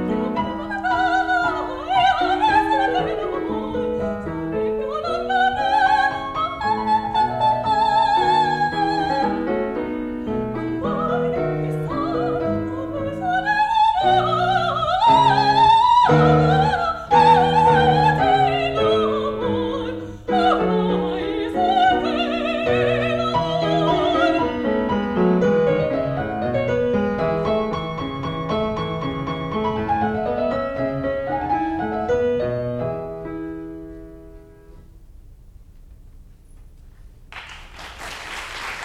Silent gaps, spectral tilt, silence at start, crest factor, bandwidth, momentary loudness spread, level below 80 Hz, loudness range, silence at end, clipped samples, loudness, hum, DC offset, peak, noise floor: none; -6.5 dB/octave; 0 s; 16 dB; 12 kHz; 12 LU; -42 dBFS; 8 LU; 0 s; under 0.1%; -20 LUFS; none; under 0.1%; -4 dBFS; -44 dBFS